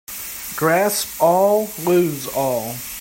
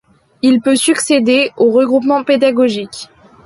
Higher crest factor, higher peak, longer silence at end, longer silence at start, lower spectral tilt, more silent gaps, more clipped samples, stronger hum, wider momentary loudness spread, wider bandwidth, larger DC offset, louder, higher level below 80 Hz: about the same, 16 dB vs 12 dB; about the same, -4 dBFS vs -2 dBFS; second, 0 s vs 0.4 s; second, 0.1 s vs 0.45 s; about the same, -4 dB/octave vs -3.5 dB/octave; neither; neither; neither; first, 11 LU vs 7 LU; first, 16.5 kHz vs 12 kHz; neither; second, -19 LUFS vs -12 LUFS; first, -54 dBFS vs -60 dBFS